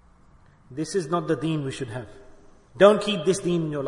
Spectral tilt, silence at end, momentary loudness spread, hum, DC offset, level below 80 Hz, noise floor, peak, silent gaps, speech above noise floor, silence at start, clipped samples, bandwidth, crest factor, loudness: -5.5 dB/octave; 0 s; 18 LU; none; under 0.1%; -56 dBFS; -54 dBFS; -2 dBFS; none; 31 dB; 0.7 s; under 0.1%; 11 kHz; 22 dB; -23 LUFS